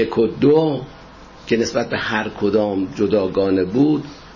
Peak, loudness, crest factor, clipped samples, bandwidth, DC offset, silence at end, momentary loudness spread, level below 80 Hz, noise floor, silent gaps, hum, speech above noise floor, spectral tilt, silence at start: -4 dBFS; -19 LUFS; 14 dB; under 0.1%; 7.2 kHz; under 0.1%; 0 s; 8 LU; -48 dBFS; -41 dBFS; none; none; 23 dB; -6.5 dB/octave; 0 s